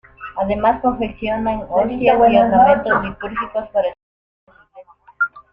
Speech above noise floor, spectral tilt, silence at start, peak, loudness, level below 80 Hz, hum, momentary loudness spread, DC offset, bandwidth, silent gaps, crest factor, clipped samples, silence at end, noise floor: 29 dB; -8.5 dB/octave; 0.2 s; -2 dBFS; -17 LUFS; -42 dBFS; none; 12 LU; under 0.1%; 5.2 kHz; 4.03-4.47 s; 16 dB; under 0.1%; 0.1 s; -45 dBFS